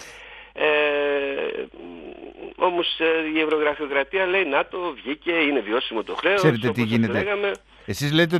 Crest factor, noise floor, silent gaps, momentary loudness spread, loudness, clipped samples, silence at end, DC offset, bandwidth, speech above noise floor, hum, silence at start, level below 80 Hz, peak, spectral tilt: 20 dB; -43 dBFS; none; 19 LU; -22 LUFS; under 0.1%; 0 s; under 0.1%; 13.5 kHz; 21 dB; none; 0 s; -56 dBFS; -4 dBFS; -5.5 dB/octave